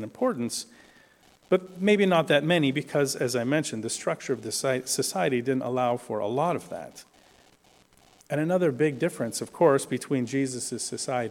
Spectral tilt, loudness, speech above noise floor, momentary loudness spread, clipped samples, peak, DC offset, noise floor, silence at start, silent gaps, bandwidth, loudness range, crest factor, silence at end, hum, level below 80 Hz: -4.5 dB/octave; -26 LUFS; 33 dB; 9 LU; under 0.1%; -8 dBFS; under 0.1%; -60 dBFS; 0 s; none; 17 kHz; 5 LU; 20 dB; 0 s; none; -70 dBFS